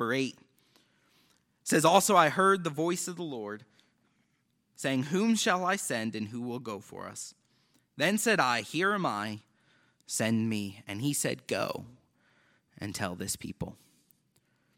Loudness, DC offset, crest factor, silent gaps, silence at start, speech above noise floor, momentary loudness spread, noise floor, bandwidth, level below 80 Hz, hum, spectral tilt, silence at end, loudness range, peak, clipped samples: -29 LUFS; under 0.1%; 26 dB; none; 0 s; 45 dB; 18 LU; -75 dBFS; 17 kHz; -70 dBFS; none; -4 dB/octave; 1.05 s; 7 LU; -6 dBFS; under 0.1%